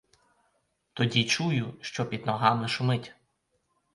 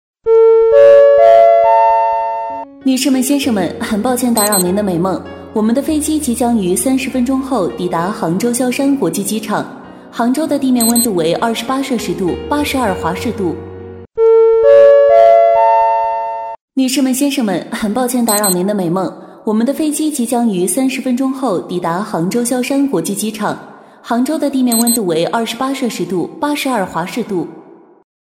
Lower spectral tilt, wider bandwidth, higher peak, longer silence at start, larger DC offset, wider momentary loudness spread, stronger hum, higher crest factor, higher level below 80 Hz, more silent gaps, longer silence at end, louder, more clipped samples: about the same, -5 dB/octave vs -4.5 dB/octave; second, 11.5 kHz vs 17 kHz; second, -6 dBFS vs 0 dBFS; first, 0.95 s vs 0.25 s; neither; second, 10 LU vs 13 LU; neither; first, 24 dB vs 12 dB; second, -66 dBFS vs -46 dBFS; second, none vs 16.61-16.68 s; first, 0.8 s vs 0.6 s; second, -28 LUFS vs -13 LUFS; neither